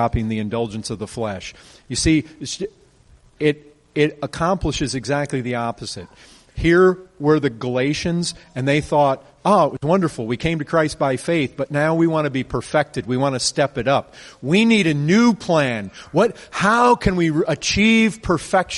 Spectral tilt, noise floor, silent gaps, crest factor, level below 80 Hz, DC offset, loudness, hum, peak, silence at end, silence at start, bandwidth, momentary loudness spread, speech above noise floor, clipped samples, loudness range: -5 dB/octave; -51 dBFS; none; 16 dB; -40 dBFS; under 0.1%; -19 LUFS; none; -4 dBFS; 0 s; 0 s; 11.5 kHz; 12 LU; 32 dB; under 0.1%; 6 LU